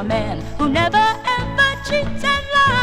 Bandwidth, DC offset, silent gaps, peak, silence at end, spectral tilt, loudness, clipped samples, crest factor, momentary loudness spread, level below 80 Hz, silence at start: 15 kHz; under 0.1%; none; -2 dBFS; 0 s; -4.5 dB/octave; -18 LUFS; under 0.1%; 16 dB; 7 LU; -34 dBFS; 0 s